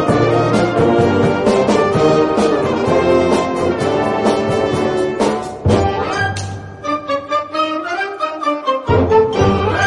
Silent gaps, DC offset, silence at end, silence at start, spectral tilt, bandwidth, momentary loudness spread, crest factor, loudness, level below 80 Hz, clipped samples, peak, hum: none; under 0.1%; 0 s; 0 s; -6 dB/octave; 11.5 kHz; 7 LU; 14 dB; -15 LUFS; -40 dBFS; under 0.1%; -2 dBFS; none